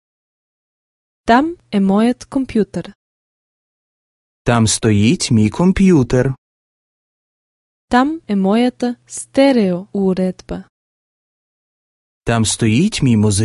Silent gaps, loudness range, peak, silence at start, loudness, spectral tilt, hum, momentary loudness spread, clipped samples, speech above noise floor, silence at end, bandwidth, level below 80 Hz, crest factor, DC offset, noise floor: 2.95-4.45 s, 6.38-7.88 s, 10.69-12.21 s; 4 LU; 0 dBFS; 1.25 s; -15 LUFS; -5.5 dB/octave; none; 11 LU; under 0.1%; over 76 dB; 0 s; 11.5 kHz; -40 dBFS; 16 dB; under 0.1%; under -90 dBFS